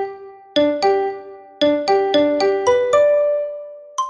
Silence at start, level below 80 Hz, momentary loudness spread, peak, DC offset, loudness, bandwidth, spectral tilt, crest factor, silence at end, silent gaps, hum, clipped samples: 0 s; -58 dBFS; 14 LU; -4 dBFS; under 0.1%; -17 LUFS; 9.4 kHz; -3.5 dB/octave; 14 dB; 0 s; none; none; under 0.1%